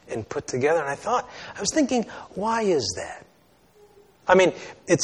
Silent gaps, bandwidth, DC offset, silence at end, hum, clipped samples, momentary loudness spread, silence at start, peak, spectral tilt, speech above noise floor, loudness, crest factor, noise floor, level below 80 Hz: none; 11.5 kHz; under 0.1%; 0 s; none; under 0.1%; 16 LU; 0.1 s; -4 dBFS; -4 dB/octave; 35 dB; -24 LUFS; 22 dB; -58 dBFS; -58 dBFS